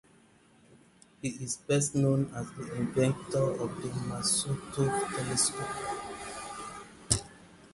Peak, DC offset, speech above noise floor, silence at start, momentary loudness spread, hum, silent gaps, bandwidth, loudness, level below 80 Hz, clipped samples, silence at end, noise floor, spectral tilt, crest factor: -6 dBFS; under 0.1%; 30 dB; 0.7 s; 12 LU; none; none; 11.5 kHz; -31 LUFS; -56 dBFS; under 0.1%; 0.05 s; -61 dBFS; -4.5 dB/octave; 26 dB